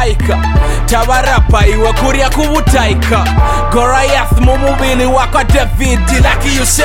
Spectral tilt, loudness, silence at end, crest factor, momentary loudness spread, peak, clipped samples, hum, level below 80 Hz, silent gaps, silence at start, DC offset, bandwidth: -4.5 dB/octave; -11 LUFS; 0 s; 8 dB; 3 LU; 0 dBFS; 0.2%; none; -12 dBFS; none; 0 s; under 0.1%; 17 kHz